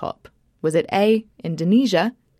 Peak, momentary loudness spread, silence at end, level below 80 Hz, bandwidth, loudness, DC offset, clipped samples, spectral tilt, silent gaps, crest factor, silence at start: -6 dBFS; 13 LU; 0.3 s; -62 dBFS; 14 kHz; -20 LUFS; under 0.1%; under 0.1%; -6 dB/octave; none; 16 dB; 0 s